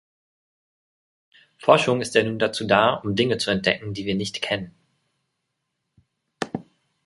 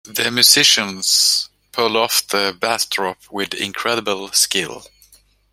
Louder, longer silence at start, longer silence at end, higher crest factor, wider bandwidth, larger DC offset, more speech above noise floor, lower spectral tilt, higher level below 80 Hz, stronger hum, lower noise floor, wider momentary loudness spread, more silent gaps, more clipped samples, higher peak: second, -22 LUFS vs -15 LUFS; first, 1.6 s vs 0.05 s; second, 0.45 s vs 0.65 s; first, 24 dB vs 18 dB; second, 11.5 kHz vs 16.5 kHz; neither; first, 57 dB vs 34 dB; first, -4.5 dB/octave vs -0.5 dB/octave; about the same, -58 dBFS vs -60 dBFS; second, none vs 50 Hz at -60 dBFS; first, -78 dBFS vs -52 dBFS; about the same, 14 LU vs 13 LU; neither; neither; about the same, -2 dBFS vs 0 dBFS